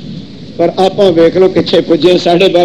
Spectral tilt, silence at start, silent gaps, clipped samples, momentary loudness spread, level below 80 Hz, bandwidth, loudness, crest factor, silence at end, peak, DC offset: -6 dB/octave; 0 s; none; 1%; 16 LU; -44 dBFS; 10.5 kHz; -9 LUFS; 10 dB; 0 s; 0 dBFS; 1%